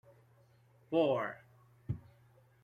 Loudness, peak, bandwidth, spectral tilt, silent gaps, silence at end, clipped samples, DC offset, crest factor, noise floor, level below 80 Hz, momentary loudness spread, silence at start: -36 LUFS; -18 dBFS; 13 kHz; -8.5 dB/octave; none; 0.65 s; under 0.1%; under 0.1%; 20 dB; -66 dBFS; -66 dBFS; 21 LU; 0.9 s